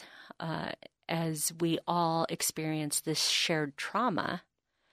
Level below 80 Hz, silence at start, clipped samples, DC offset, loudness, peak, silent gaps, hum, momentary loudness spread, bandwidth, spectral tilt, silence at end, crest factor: -72 dBFS; 0 s; under 0.1%; under 0.1%; -31 LUFS; -14 dBFS; none; none; 12 LU; 15.5 kHz; -3.5 dB/octave; 0.55 s; 18 dB